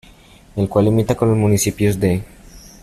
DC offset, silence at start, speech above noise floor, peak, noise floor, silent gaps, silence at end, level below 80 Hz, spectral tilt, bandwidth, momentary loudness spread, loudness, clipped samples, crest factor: under 0.1%; 0.55 s; 29 dB; -2 dBFS; -45 dBFS; none; 0.25 s; -42 dBFS; -6.5 dB/octave; 14.5 kHz; 8 LU; -17 LUFS; under 0.1%; 14 dB